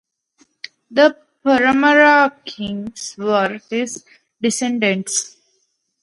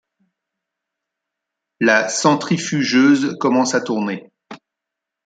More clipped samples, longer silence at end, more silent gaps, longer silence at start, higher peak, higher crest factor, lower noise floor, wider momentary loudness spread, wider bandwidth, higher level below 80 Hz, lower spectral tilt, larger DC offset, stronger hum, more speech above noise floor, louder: neither; about the same, 0.75 s vs 0.7 s; neither; second, 0.9 s vs 1.8 s; about the same, 0 dBFS vs -2 dBFS; about the same, 18 dB vs 18 dB; second, -67 dBFS vs -83 dBFS; first, 18 LU vs 9 LU; first, 11.5 kHz vs 9.4 kHz; first, -60 dBFS vs -68 dBFS; about the same, -3 dB/octave vs -4 dB/octave; neither; neither; second, 51 dB vs 67 dB; about the same, -17 LUFS vs -17 LUFS